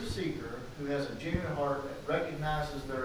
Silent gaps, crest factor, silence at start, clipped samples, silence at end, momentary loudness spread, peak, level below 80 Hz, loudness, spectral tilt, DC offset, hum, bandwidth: none; 18 dB; 0 s; under 0.1%; 0 s; 5 LU; -18 dBFS; -48 dBFS; -35 LUFS; -6 dB/octave; under 0.1%; none; over 20 kHz